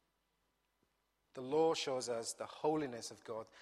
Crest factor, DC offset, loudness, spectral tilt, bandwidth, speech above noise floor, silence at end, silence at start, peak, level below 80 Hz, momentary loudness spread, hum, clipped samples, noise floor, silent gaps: 18 dB; under 0.1%; -39 LUFS; -3.5 dB/octave; 13.5 kHz; 43 dB; 0 s; 1.35 s; -24 dBFS; -82 dBFS; 14 LU; none; under 0.1%; -82 dBFS; none